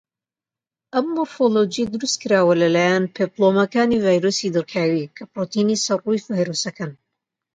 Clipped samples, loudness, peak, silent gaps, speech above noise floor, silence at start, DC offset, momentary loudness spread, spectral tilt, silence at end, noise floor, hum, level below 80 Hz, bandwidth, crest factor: under 0.1%; -20 LUFS; -4 dBFS; none; over 71 dB; 0.95 s; under 0.1%; 9 LU; -4.5 dB/octave; 0.6 s; under -90 dBFS; none; -60 dBFS; 9.4 kHz; 16 dB